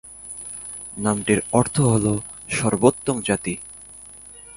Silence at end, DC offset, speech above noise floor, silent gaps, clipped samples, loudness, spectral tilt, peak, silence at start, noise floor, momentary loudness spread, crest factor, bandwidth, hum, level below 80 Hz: 0 s; under 0.1%; 22 dB; none; under 0.1%; -22 LUFS; -5 dB/octave; 0 dBFS; 0.05 s; -43 dBFS; 20 LU; 22 dB; 11.5 kHz; 50 Hz at -45 dBFS; -48 dBFS